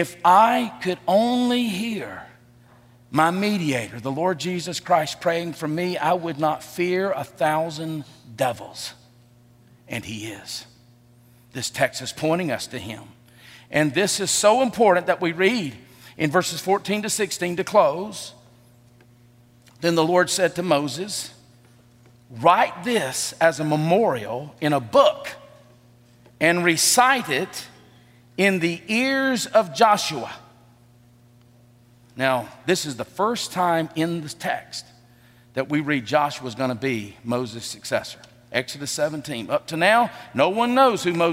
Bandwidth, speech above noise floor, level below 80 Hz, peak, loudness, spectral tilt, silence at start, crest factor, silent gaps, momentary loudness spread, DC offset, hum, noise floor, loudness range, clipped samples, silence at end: 16 kHz; 31 dB; -66 dBFS; -4 dBFS; -22 LUFS; -4 dB/octave; 0 s; 20 dB; none; 15 LU; under 0.1%; none; -53 dBFS; 7 LU; under 0.1%; 0 s